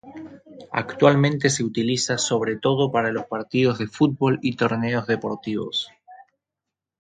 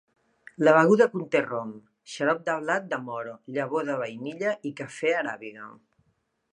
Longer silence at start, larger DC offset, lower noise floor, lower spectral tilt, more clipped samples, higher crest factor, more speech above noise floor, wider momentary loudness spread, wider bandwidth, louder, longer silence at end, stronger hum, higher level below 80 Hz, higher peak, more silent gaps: second, 0.05 s vs 0.6 s; neither; first, -86 dBFS vs -72 dBFS; about the same, -5 dB/octave vs -6 dB/octave; neither; about the same, 20 dB vs 24 dB; first, 64 dB vs 46 dB; second, 10 LU vs 20 LU; about the same, 9.6 kHz vs 10.5 kHz; first, -22 LUFS vs -26 LUFS; about the same, 0.8 s vs 0.8 s; neither; first, -60 dBFS vs -78 dBFS; about the same, -2 dBFS vs -4 dBFS; neither